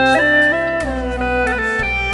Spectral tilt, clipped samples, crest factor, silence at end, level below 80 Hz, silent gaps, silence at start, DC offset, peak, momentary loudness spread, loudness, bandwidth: -5 dB/octave; under 0.1%; 16 dB; 0 s; -30 dBFS; none; 0 s; under 0.1%; 0 dBFS; 9 LU; -16 LUFS; 11.5 kHz